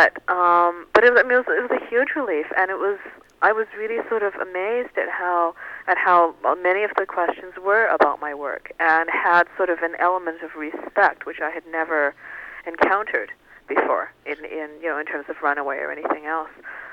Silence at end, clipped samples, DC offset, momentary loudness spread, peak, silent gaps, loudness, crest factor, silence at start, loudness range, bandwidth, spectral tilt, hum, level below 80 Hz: 0 s; under 0.1%; under 0.1%; 14 LU; -2 dBFS; none; -21 LUFS; 20 dB; 0 s; 5 LU; 7.6 kHz; -5 dB/octave; none; -62 dBFS